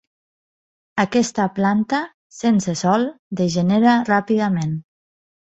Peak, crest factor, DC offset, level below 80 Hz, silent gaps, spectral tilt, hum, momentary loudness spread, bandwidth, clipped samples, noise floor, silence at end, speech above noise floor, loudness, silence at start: -2 dBFS; 18 dB; under 0.1%; -58 dBFS; 2.14-2.30 s, 3.19-3.31 s; -6 dB/octave; none; 10 LU; 8.2 kHz; under 0.1%; under -90 dBFS; 0.8 s; over 72 dB; -19 LUFS; 0.95 s